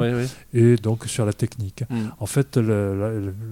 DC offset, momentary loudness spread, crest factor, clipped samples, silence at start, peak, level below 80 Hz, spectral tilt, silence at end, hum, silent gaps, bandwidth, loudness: under 0.1%; 10 LU; 16 dB; under 0.1%; 0 s; -6 dBFS; -52 dBFS; -7 dB/octave; 0 s; none; none; 16 kHz; -23 LUFS